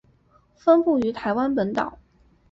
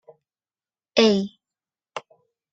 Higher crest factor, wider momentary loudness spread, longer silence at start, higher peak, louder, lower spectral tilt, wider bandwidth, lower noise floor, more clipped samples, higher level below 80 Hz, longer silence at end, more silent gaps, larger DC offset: second, 16 dB vs 24 dB; second, 9 LU vs 20 LU; second, 0.65 s vs 0.95 s; second, -6 dBFS vs -2 dBFS; about the same, -22 LUFS vs -20 LUFS; first, -7.5 dB/octave vs -5 dB/octave; about the same, 7.6 kHz vs 7.8 kHz; second, -59 dBFS vs under -90 dBFS; neither; first, -56 dBFS vs -68 dBFS; about the same, 0.55 s vs 0.55 s; neither; neither